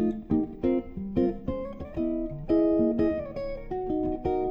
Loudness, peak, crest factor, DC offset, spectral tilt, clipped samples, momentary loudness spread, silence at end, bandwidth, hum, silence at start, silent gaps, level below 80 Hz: -28 LUFS; -14 dBFS; 14 dB; under 0.1%; -10.5 dB/octave; under 0.1%; 10 LU; 0 s; 5.4 kHz; none; 0 s; none; -42 dBFS